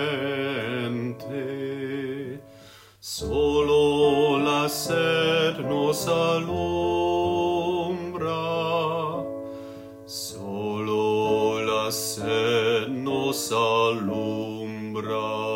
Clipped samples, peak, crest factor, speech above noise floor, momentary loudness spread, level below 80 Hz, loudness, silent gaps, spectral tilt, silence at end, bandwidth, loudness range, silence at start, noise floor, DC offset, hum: under 0.1%; -10 dBFS; 14 dB; 25 dB; 12 LU; -52 dBFS; -25 LUFS; none; -4.5 dB/octave; 0 s; 16 kHz; 6 LU; 0 s; -49 dBFS; under 0.1%; none